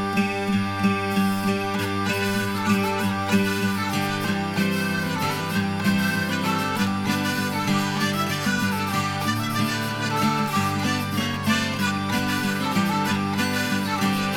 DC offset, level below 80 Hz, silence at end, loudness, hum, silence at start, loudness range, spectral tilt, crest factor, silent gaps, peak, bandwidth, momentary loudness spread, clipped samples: under 0.1%; -54 dBFS; 0 s; -23 LUFS; none; 0 s; 1 LU; -4.5 dB/octave; 16 dB; none; -8 dBFS; 17.5 kHz; 2 LU; under 0.1%